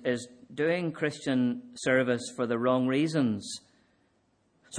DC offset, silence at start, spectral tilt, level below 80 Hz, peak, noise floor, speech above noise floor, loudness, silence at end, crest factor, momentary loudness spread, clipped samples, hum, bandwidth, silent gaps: under 0.1%; 0 s; -5.5 dB/octave; -72 dBFS; -12 dBFS; -70 dBFS; 42 dB; -29 LUFS; 0 s; 18 dB; 9 LU; under 0.1%; none; 10.5 kHz; none